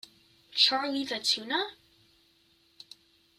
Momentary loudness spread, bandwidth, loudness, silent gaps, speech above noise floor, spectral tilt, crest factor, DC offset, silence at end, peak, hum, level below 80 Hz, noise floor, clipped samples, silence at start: 11 LU; 15.5 kHz; -27 LUFS; none; 37 dB; -0.5 dB/octave; 24 dB; under 0.1%; 1.65 s; -8 dBFS; none; -78 dBFS; -66 dBFS; under 0.1%; 0.5 s